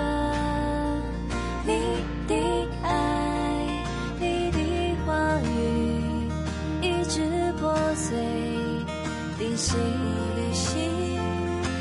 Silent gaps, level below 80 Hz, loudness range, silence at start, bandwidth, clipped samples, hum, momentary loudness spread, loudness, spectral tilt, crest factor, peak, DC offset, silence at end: none; -36 dBFS; 1 LU; 0 s; 11.5 kHz; under 0.1%; none; 5 LU; -27 LUFS; -5.5 dB/octave; 14 dB; -12 dBFS; under 0.1%; 0 s